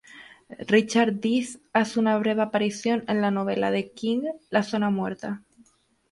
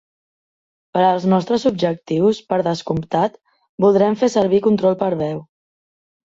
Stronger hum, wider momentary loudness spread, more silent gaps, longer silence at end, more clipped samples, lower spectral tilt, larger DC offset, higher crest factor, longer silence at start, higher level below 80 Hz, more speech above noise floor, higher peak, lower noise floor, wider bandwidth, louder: neither; about the same, 8 LU vs 8 LU; second, none vs 3.69-3.78 s; second, 0.75 s vs 0.9 s; neither; second, -5.5 dB/octave vs -7 dB/octave; neither; about the same, 20 dB vs 16 dB; second, 0.15 s vs 0.95 s; second, -68 dBFS vs -56 dBFS; second, 38 dB vs over 73 dB; second, -6 dBFS vs -2 dBFS; second, -62 dBFS vs under -90 dBFS; first, 11.5 kHz vs 7.8 kHz; second, -25 LUFS vs -18 LUFS